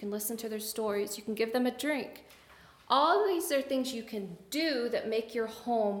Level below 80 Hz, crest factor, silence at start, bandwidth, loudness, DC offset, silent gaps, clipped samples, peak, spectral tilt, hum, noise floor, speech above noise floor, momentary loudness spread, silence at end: -72 dBFS; 20 dB; 0 s; 18 kHz; -32 LUFS; under 0.1%; none; under 0.1%; -12 dBFS; -3.5 dB/octave; none; -57 dBFS; 26 dB; 10 LU; 0 s